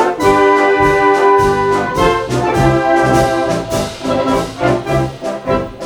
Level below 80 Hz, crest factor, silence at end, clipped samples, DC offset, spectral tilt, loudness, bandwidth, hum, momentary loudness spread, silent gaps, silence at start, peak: -32 dBFS; 12 dB; 0 s; under 0.1%; under 0.1%; -5.5 dB/octave; -13 LUFS; 18 kHz; none; 8 LU; none; 0 s; 0 dBFS